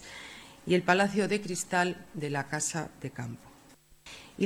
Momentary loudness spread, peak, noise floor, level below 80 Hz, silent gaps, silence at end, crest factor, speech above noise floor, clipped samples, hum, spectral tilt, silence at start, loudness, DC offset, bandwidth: 21 LU; -8 dBFS; -58 dBFS; -64 dBFS; none; 0 s; 24 dB; 28 dB; under 0.1%; none; -4 dB/octave; 0 s; -30 LUFS; under 0.1%; 16.5 kHz